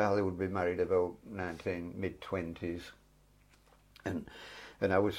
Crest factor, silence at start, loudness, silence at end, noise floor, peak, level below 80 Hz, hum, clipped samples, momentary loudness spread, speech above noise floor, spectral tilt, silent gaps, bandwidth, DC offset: 20 dB; 0 s; -36 LUFS; 0 s; -65 dBFS; -14 dBFS; -62 dBFS; 50 Hz at -65 dBFS; under 0.1%; 14 LU; 31 dB; -7 dB/octave; none; 15.5 kHz; under 0.1%